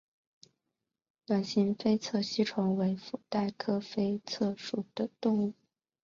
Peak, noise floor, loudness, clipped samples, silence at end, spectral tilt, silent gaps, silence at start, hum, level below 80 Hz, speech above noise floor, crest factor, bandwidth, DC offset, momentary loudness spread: -16 dBFS; -87 dBFS; -32 LUFS; under 0.1%; 0.5 s; -6 dB/octave; none; 1.3 s; none; -72 dBFS; 56 dB; 18 dB; 7.4 kHz; under 0.1%; 7 LU